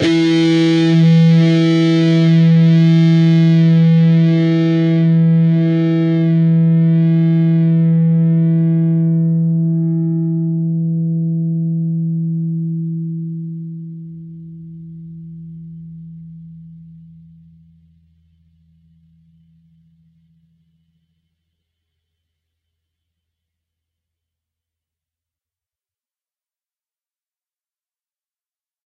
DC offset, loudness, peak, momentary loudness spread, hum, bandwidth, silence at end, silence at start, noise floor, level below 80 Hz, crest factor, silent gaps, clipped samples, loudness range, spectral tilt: under 0.1%; -13 LUFS; -4 dBFS; 23 LU; none; 6.8 kHz; 12.1 s; 0 s; under -90 dBFS; -64 dBFS; 12 dB; none; under 0.1%; 21 LU; -8.5 dB/octave